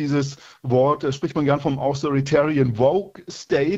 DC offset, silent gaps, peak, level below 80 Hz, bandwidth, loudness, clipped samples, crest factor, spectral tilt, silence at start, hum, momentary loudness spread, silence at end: under 0.1%; none; -4 dBFS; -52 dBFS; 8 kHz; -21 LUFS; under 0.1%; 16 dB; -7 dB/octave; 0 s; none; 10 LU; 0 s